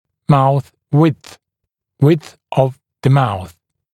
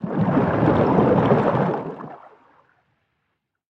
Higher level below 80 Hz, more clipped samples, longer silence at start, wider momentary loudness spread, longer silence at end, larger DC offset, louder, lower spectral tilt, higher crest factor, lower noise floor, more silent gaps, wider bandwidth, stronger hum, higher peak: about the same, -50 dBFS vs -50 dBFS; neither; first, 0.3 s vs 0 s; second, 9 LU vs 16 LU; second, 0.45 s vs 1.55 s; neither; first, -16 LUFS vs -19 LUFS; second, -8.5 dB/octave vs -10 dB/octave; about the same, 16 dB vs 18 dB; about the same, -79 dBFS vs -76 dBFS; neither; first, 12 kHz vs 6.4 kHz; neither; first, 0 dBFS vs -4 dBFS